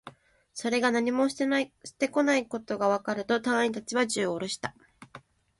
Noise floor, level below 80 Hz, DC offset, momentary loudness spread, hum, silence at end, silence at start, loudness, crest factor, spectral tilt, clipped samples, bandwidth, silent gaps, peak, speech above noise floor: -53 dBFS; -68 dBFS; under 0.1%; 9 LU; none; 0.4 s; 0.05 s; -28 LUFS; 18 dB; -3.5 dB/octave; under 0.1%; 11.5 kHz; none; -12 dBFS; 25 dB